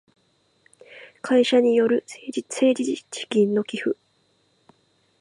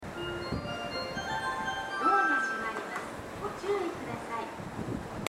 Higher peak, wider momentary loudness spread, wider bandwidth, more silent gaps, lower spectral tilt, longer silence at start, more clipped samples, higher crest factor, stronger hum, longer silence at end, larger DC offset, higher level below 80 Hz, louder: first, -8 dBFS vs -12 dBFS; about the same, 14 LU vs 12 LU; second, 11.5 kHz vs 16 kHz; neither; about the same, -4.5 dB/octave vs -4.5 dB/octave; first, 0.9 s vs 0 s; neither; about the same, 16 dB vs 20 dB; neither; first, 1.3 s vs 0 s; neither; second, -78 dBFS vs -54 dBFS; first, -22 LUFS vs -33 LUFS